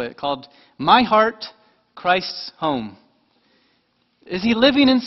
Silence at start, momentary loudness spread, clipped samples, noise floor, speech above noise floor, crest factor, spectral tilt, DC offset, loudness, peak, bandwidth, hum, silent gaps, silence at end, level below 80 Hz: 0 s; 16 LU; under 0.1%; -65 dBFS; 46 dB; 20 dB; -6 dB/octave; under 0.1%; -19 LUFS; 0 dBFS; 6 kHz; none; none; 0 s; -54 dBFS